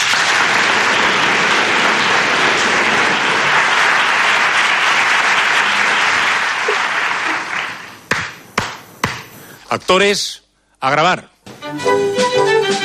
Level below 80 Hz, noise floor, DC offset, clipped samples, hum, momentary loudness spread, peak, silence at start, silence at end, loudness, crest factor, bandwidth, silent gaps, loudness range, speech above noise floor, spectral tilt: -54 dBFS; -37 dBFS; under 0.1%; under 0.1%; none; 10 LU; -2 dBFS; 0 s; 0 s; -13 LUFS; 12 dB; 14.5 kHz; none; 7 LU; 22 dB; -2 dB/octave